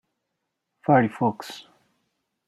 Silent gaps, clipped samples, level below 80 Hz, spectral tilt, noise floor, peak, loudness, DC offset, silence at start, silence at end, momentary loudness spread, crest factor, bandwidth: none; under 0.1%; -70 dBFS; -7 dB/octave; -80 dBFS; -6 dBFS; -23 LUFS; under 0.1%; 0.9 s; 0.85 s; 19 LU; 22 dB; 14 kHz